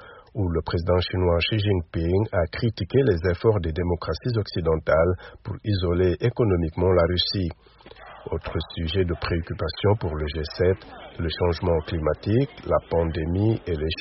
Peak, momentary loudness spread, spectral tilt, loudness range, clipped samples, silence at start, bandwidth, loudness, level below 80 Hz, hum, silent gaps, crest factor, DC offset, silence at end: -6 dBFS; 9 LU; -5.5 dB/octave; 3 LU; under 0.1%; 0 s; 6 kHz; -24 LUFS; -38 dBFS; none; none; 16 dB; under 0.1%; 0 s